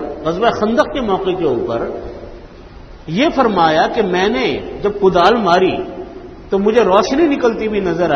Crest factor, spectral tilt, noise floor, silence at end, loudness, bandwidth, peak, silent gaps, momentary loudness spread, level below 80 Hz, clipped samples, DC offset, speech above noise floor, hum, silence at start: 16 dB; -6 dB/octave; -36 dBFS; 0 s; -15 LUFS; 7.2 kHz; 0 dBFS; none; 16 LU; -40 dBFS; under 0.1%; under 0.1%; 21 dB; none; 0 s